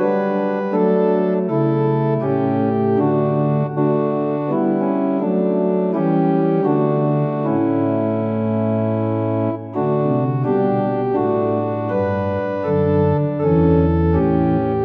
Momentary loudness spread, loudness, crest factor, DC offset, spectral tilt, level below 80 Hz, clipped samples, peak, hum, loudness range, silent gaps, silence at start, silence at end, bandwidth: 4 LU; -18 LUFS; 14 dB; under 0.1%; -12 dB/octave; -40 dBFS; under 0.1%; -2 dBFS; none; 2 LU; none; 0 s; 0 s; 5.2 kHz